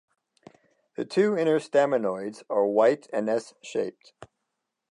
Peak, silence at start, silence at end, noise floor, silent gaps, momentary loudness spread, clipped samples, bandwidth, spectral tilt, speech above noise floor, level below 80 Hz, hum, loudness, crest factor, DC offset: -8 dBFS; 1 s; 0.7 s; -82 dBFS; none; 13 LU; under 0.1%; 11 kHz; -6 dB/octave; 57 dB; -78 dBFS; none; -26 LUFS; 18 dB; under 0.1%